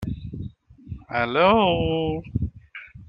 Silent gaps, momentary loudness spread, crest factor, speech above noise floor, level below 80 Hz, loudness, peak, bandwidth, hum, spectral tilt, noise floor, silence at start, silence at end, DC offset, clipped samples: none; 23 LU; 20 dB; 23 dB; -42 dBFS; -23 LUFS; -4 dBFS; 5.8 kHz; none; -8.5 dB/octave; -43 dBFS; 0 s; 0.05 s; under 0.1%; under 0.1%